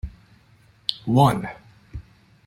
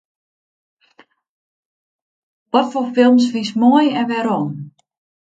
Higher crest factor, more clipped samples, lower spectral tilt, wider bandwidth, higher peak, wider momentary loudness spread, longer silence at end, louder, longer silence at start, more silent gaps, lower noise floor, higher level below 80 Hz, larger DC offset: first, 24 dB vs 18 dB; neither; about the same, -6.5 dB/octave vs -6 dB/octave; first, 16 kHz vs 7.8 kHz; about the same, -2 dBFS vs 0 dBFS; first, 24 LU vs 8 LU; about the same, 0.45 s vs 0.55 s; second, -21 LUFS vs -16 LUFS; second, 0.05 s vs 2.55 s; neither; about the same, -56 dBFS vs -53 dBFS; first, -44 dBFS vs -70 dBFS; neither